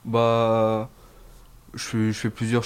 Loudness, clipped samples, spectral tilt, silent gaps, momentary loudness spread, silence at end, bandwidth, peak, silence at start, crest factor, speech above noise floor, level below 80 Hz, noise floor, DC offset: -23 LUFS; under 0.1%; -6 dB/octave; none; 15 LU; 0 s; 15.5 kHz; -8 dBFS; 0.05 s; 16 dB; 25 dB; -52 dBFS; -48 dBFS; under 0.1%